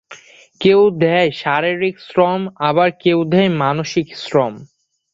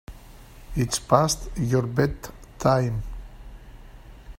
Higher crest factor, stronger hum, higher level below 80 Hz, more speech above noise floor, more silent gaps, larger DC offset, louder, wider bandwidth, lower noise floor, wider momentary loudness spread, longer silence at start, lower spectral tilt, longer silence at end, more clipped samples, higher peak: second, 14 dB vs 24 dB; neither; second, -56 dBFS vs -40 dBFS; about the same, 26 dB vs 23 dB; neither; neither; first, -16 LUFS vs -24 LUFS; second, 7.6 kHz vs 16 kHz; second, -41 dBFS vs -45 dBFS; second, 7 LU vs 20 LU; about the same, 0.1 s vs 0.1 s; about the same, -6.5 dB/octave vs -5.5 dB/octave; first, 0.5 s vs 0.05 s; neither; about the same, -2 dBFS vs -2 dBFS